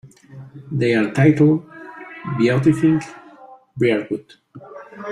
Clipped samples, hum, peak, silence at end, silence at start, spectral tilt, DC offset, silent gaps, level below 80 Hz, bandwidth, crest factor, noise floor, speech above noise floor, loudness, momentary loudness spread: under 0.1%; none; -2 dBFS; 0 s; 0.05 s; -8 dB/octave; under 0.1%; none; -56 dBFS; 10.5 kHz; 18 dB; -44 dBFS; 27 dB; -18 LUFS; 24 LU